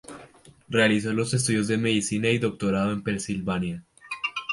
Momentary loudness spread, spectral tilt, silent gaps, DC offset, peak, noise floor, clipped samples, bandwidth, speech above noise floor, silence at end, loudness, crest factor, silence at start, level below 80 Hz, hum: 12 LU; -4.5 dB/octave; none; under 0.1%; -6 dBFS; -51 dBFS; under 0.1%; 11.5 kHz; 27 dB; 0 s; -25 LUFS; 20 dB; 0.1 s; -54 dBFS; none